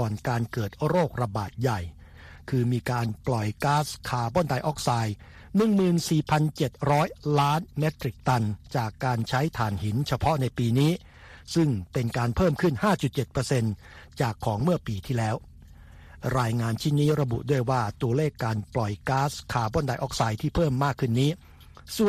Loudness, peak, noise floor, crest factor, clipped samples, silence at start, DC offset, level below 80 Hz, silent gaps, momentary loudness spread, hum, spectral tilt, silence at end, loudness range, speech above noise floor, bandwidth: -27 LUFS; -8 dBFS; -48 dBFS; 18 dB; under 0.1%; 0 s; under 0.1%; -46 dBFS; none; 7 LU; none; -6.5 dB/octave; 0 s; 3 LU; 22 dB; 15 kHz